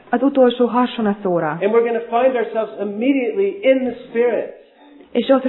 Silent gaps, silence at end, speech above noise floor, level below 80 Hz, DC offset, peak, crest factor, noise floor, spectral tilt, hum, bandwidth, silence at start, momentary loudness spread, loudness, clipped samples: none; 0 s; 29 dB; -62 dBFS; under 0.1%; -2 dBFS; 16 dB; -46 dBFS; -10 dB/octave; none; 4.2 kHz; 0.1 s; 8 LU; -18 LUFS; under 0.1%